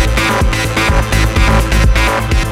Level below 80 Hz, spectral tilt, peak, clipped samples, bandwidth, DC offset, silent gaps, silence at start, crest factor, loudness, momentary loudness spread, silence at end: -14 dBFS; -4.5 dB/octave; 0 dBFS; under 0.1%; 15.5 kHz; under 0.1%; none; 0 s; 10 dB; -12 LUFS; 2 LU; 0 s